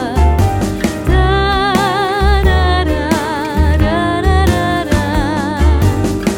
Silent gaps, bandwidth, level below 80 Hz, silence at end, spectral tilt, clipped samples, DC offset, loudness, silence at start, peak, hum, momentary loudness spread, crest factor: none; 16.5 kHz; -16 dBFS; 0 s; -6 dB/octave; under 0.1%; under 0.1%; -14 LUFS; 0 s; 0 dBFS; none; 4 LU; 12 dB